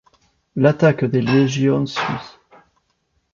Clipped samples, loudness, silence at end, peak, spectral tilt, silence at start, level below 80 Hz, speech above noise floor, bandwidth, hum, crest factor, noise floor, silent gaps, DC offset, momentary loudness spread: under 0.1%; -18 LUFS; 1.05 s; -2 dBFS; -7 dB/octave; 0.55 s; -56 dBFS; 51 dB; 7.4 kHz; none; 18 dB; -68 dBFS; none; under 0.1%; 11 LU